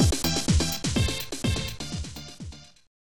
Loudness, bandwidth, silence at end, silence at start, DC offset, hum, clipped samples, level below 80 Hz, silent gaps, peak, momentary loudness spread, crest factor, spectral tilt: -27 LUFS; 18 kHz; 0.25 s; 0 s; 0.5%; none; under 0.1%; -34 dBFS; none; -10 dBFS; 18 LU; 18 dB; -4 dB/octave